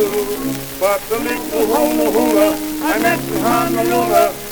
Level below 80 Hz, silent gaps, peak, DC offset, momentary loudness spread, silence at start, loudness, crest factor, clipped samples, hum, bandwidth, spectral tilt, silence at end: -42 dBFS; none; 0 dBFS; under 0.1%; 6 LU; 0 s; -16 LUFS; 16 dB; under 0.1%; none; over 20 kHz; -4 dB/octave; 0 s